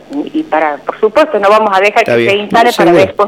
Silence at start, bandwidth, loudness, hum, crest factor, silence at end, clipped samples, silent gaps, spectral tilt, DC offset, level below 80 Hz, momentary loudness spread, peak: 0.1 s; 16.5 kHz; -10 LUFS; none; 10 dB; 0 s; 0.4%; none; -5 dB/octave; under 0.1%; -48 dBFS; 7 LU; 0 dBFS